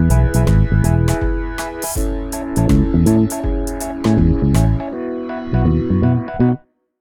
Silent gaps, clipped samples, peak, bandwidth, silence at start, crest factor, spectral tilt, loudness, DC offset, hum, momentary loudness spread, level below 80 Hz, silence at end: none; under 0.1%; 0 dBFS; 19 kHz; 0 s; 14 dB; -7 dB/octave; -17 LUFS; under 0.1%; none; 10 LU; -22 dBFS; 0.45 s